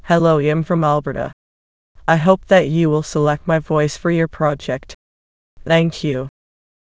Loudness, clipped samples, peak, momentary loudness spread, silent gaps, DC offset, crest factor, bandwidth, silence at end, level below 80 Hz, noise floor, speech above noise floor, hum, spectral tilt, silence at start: -17 LUFS; under 0.1%; 0 dBFS; 12 LU; 1.33-1.95 s, 4.94-5.57 s; under 0.1%; 18 dB; 8 kHz; 0.6 s; -46 dBFS; under -90 dBFS; over 74 dB; none; -6.5 dB/octave; 0.05 s